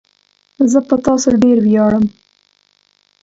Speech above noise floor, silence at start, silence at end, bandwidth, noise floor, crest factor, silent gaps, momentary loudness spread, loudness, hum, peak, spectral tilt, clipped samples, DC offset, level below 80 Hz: 47 dB; 0.6 s; 1.15 s; 8 kHz; -58 dBFS; 14 dB; none; 6 LU; -13 LUFS; 50 Hz at -45 dBFS; 0 dBFS; -6 dB/octave; under 0.1%; under 0.1%; -48 dBFS